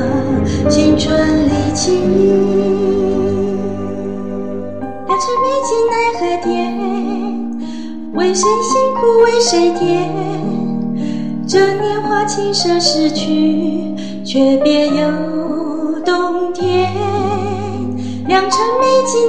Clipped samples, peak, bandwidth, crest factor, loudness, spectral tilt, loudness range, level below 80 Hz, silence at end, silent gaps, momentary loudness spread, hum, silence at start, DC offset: under 0.1%; 0 dBFS; 9.8 kHz; 14 dB; -15 LUFS; -5 dB/octave; 3 LU; -40 dBFS; 0 s; none; 10 LU; none; 0 s; 3%